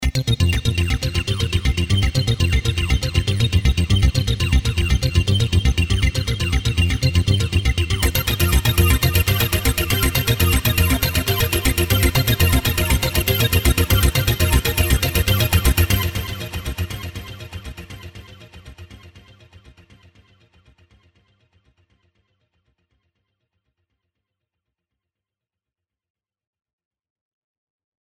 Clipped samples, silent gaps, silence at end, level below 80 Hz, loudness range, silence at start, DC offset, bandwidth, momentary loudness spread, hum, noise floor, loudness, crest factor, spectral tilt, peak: under 0.1%; none; 8.85 s; -26 dBFS; 8 LU; 0 s; under 0.1%; over 20 kHz; 10 LU; none; -88 dBFS; -18 LUFS; 18 dB; -4.5 dB/octave; -2 dBFS